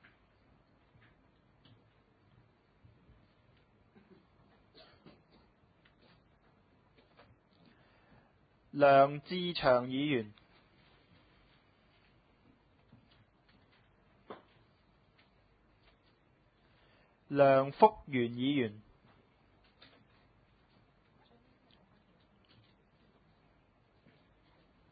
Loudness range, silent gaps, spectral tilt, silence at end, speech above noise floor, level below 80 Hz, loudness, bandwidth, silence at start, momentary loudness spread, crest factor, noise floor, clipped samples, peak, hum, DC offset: 10 LU; none; -4.5 dB/octave; 6.1 s; 41 dB; -70 dBFS; -30 LUFS; 4.8 kHz; 8.75 s; 28 LU; 30 dB; -70 dBFS; under 0.1%; -8 dBFS; none; under 0.1%